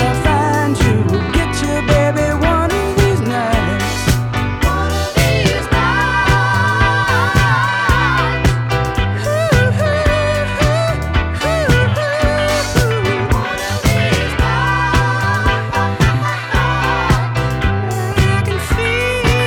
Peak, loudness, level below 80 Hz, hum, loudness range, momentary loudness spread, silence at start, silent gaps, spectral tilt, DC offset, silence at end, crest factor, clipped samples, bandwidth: 0 dBFS; -15 LUFS; -24 dBFS; none; 2 LU; 4 LU; 0 s; none; -5.5 dB/octave; under 0.1%; 0 s; 14 dB; under 0.1%; 19 kHz